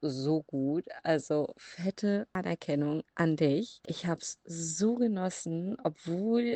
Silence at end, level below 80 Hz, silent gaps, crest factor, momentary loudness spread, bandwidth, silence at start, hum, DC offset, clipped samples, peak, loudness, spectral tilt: 0 s; -72 dBFS; none; 18 dB; 8 LU; 9 kHz; 0 s; none; under 0.1%; under 0.1%; -14 dBFS; -32 LUFS; -5.5 dB/octave